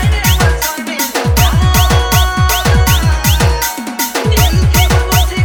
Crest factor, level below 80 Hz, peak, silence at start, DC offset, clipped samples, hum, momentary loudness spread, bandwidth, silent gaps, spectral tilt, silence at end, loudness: 10 dB; -16 dBFS; 0 dBFS; 0 s; under 0.1%; under 0.1%; none; 6 LU; over 20 kHz; none; -4 dB/octave; 0 s; -11 LUFS